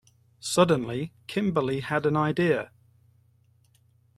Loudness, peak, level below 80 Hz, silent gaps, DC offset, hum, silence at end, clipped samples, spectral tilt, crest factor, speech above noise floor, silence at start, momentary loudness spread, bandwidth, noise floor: -26 LUFS; -6 dBFS; -62 dBFS; none; under 0.1%; none; 1.5 s; under 0.1%; -5.5 dB/octave; 22 dB; 38 dB; 0.45 s; 11 LU; 14 kHz; -63 dBFS